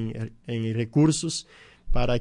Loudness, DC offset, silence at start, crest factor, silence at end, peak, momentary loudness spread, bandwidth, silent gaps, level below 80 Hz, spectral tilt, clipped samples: -26 LUFS; under 0.1%; 0 s; 14 dB; 0 s; -10 dBFS; 12 LU; 11 kHz; none; -34 dBFS; -5.5 dB/octave; under 0.1%